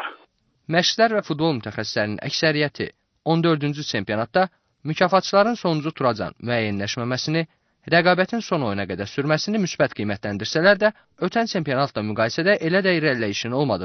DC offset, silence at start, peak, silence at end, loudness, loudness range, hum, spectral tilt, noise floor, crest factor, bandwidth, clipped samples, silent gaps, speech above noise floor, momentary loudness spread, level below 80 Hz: under 0.1%; 0 s; -4 dBFS; 0 s; -22 LUFS; 2 LU; none; -5 dB/octave; -60 dBFS; 18 dB; 6.6 kHz; under 0.1%; none; 38 dB; 9 LU; -60 dBFS